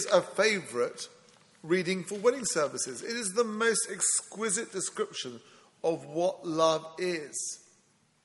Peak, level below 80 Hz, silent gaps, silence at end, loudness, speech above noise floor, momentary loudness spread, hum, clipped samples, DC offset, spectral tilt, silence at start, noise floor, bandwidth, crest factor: -8 dBFS; -78 dBFS; none; 0.65 s; -30 LUFS; 37 dB; 10 LU; none; under 0.1%; under 0.1%; -2.5 dB/octave; 0 s; -67 dBFS; 11.5 kHz; 22 dB